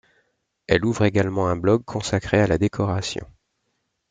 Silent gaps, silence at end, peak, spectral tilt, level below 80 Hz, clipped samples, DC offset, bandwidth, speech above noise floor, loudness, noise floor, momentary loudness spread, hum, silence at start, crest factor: none; 0.85 s; -2 dBFS; -6 dB/octave; -46 dBFS; under 0.1%; under 0.1%; 9.4 kHz; 53 dB; -22 LUFS; -74 dBFS; 6 LU; none; 0.7 s; 20 dB